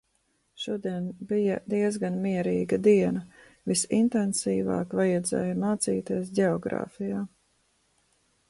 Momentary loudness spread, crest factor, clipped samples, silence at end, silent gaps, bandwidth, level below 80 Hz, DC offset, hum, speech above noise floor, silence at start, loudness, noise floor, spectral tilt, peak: 9 LU; 18 dB; under 0.1%; 1.2 s; none; 11.5 kHz; -62 dBFS; under 0.1%; none; 46 dB; 0.6 s; -27 LUFS; -72 dBFS; -5.5 dB/octave; -10 dBFS